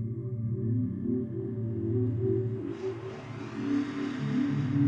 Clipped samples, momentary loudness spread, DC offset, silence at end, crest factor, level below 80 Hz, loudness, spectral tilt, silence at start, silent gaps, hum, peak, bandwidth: under 0.1%; 7 LU; under 0.1%; 0 s; 16 dB; -62 dBFS; -32 LUFS; -9 dB/octave; 0 s; none; none; -14 dBFS; 7.6 kHz